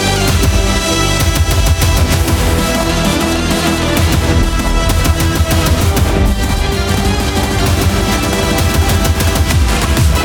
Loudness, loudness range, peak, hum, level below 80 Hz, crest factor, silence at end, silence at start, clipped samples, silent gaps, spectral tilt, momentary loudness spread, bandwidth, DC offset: -13 LUFS; 1 LU; 0 dBFS; none; -18 dBFS; 12 dB; 0 s; 0 s; under 0.1%; none; -4.5 dB/octave; 2 LU; over 20 kHz; under 0.1%